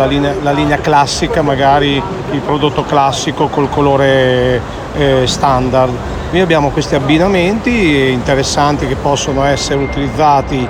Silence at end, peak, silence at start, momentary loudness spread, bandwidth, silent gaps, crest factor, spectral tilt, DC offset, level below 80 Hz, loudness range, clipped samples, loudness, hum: 0 s; 0 dBFS; 0 s; 5 LU; 15.5 kHz; none; 12 dB; -5 dB/octave; under 0.1%; -28 dBFS; 1 LU; under 0.1%; -12 LUFS; none